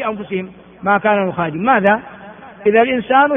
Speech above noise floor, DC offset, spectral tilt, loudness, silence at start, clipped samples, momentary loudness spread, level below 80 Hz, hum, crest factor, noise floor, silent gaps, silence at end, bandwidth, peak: 21 dB; under 0.1%; -4 dB/octave; -16 LUFS; 0 s; under 0.1%; 13 LU; -56 dBFS; none; 16 dB; -36 dBFS; none; 0 s; 3.7 kHz; 0 dBFS